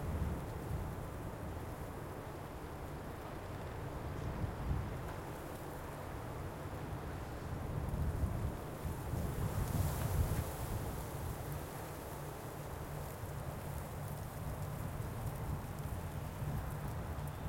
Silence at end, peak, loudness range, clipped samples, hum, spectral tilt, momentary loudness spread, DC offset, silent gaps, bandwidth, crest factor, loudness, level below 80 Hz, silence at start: 0 s; -22 dBFS; 5 LU; under 0.1%; none; -6.5 dB/octave; 8 LU; under 0.1%; none; 16.5 kHz; 18 dB; -43 LUFS; -48 dBFS; 0 s